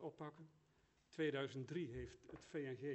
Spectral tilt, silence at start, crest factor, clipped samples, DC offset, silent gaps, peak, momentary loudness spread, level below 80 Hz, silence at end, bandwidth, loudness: -6.5 dB/octave; 0 s; 18 dB; under 0.1%; under 0.1%; none; -30 dBFS; 17 LU; -70 dBFS; 0 s; 8.2 kHz; -48 LUFS